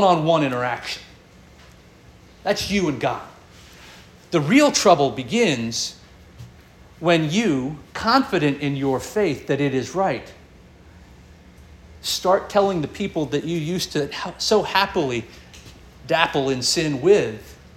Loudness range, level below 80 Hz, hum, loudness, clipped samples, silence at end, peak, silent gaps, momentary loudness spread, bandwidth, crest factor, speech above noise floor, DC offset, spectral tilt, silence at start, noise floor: 6 LU; -50 dBFS; none; -21 LUFS; under 0.1%; 0.1 s; -2 dBFS; none; 12 LU; 17 kHz; 22 dB; 28 dB; under 0.1%; -4.5 dB/octave; 0 s; -48 dBFS